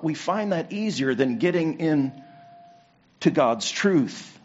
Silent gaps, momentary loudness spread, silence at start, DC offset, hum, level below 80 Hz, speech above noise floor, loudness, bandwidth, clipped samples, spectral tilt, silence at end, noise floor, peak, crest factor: none; 5 LU; 0 s; under 0.1%; none; -70 dBFS; 33 dB; -24 LUFS; 8 kHz; under 0.1%; -5 dB/octave; 0.15 s; -57 dBFS; -6 dBFS; 18 dB